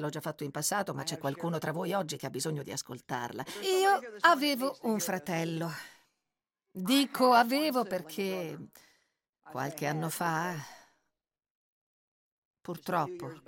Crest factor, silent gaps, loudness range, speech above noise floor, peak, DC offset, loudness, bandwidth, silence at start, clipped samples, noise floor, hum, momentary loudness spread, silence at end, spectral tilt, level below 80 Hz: 24 dB; 9.29-9.33 s, 11.50-12.51 s; 8 LU; 57 dB; -10 dBFS; under 0.1%; -31 LUFS; 17 kHz; 0 s; under 0.1%; -89 dBFS; none; 16 LU; 0.1 s; -4 dB/octave; -78 dBFS